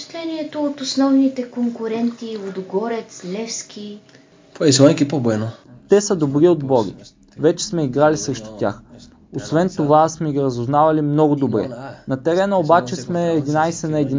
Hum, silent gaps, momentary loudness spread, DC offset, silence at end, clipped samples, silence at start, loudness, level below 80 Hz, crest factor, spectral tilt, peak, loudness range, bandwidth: none; none; 13 LU; under 0.1%; 0 s; under 0.1%; 0 s; -18 LUFS; -54 dBFS; 18 dB; -5.5 dB/octave; 0 dBFS; 4 LU; 7.6 kHz